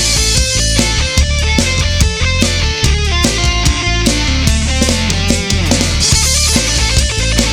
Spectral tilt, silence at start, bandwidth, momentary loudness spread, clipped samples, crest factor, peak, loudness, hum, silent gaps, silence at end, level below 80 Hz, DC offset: -3 dB/octave; 0 s; 17.5 kHz; 3 LU; under 0.1%; 12 dB; 0 dBFS; -12 LUFS; none; none; 0 s; -16 dBFS; under 0.1%